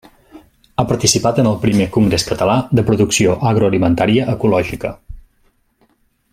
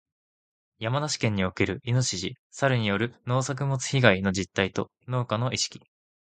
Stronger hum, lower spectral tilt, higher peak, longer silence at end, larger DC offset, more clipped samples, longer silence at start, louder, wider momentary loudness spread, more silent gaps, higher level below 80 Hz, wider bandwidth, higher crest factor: neither; about the same, -5 dB/octave vs -4.5 dB/octave; about the same, 0 dBFS vs 0 dBFS; first, 1.15 s vs 0.55 s; neither; neither; second, 0.35 s vs 0.8 s; first, -15 LUFS vs -27 LUFS; second, 7 LU vs 10 LU; second, none vs 2.39-2.50 s; first, -40 dBFS vs -52 dBFS; first, 16 kHz vs 9.4 kHz; second, 16 dB vs 26 dB